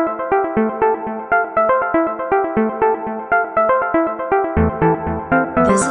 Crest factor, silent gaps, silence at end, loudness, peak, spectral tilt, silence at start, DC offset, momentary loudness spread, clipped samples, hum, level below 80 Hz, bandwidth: 14 dB; none; 0 s; -17 LUFS; -2 dBFS; -6.5 dB/octave; 0 s; 0.1%; 3 LU; under 0.1%; none; -36 dBFS; 11 kHz